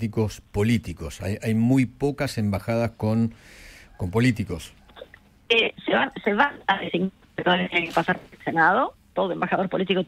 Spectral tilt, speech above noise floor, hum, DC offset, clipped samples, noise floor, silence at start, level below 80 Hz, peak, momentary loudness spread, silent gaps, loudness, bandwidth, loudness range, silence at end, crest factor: -6 dB/octave; 24 dB; none; under 0.1%; under 0.1%; -48 dBFS; 0 s; -48 dBFS; -4 dBFS; 9 LU; none; -24 LUFS; 15.5 kHz; 3 LU; 0 s; 20 dB